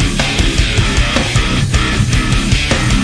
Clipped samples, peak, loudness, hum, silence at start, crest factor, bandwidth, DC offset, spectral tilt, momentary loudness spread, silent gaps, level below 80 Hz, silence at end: under 0.1%; 0 dBFS; -13 LUFS; none; 0 s; 12 dB; 11 kHz; under 0.1%; -4 dB/octave; 1 LU; none; -18 dBFS; 0 s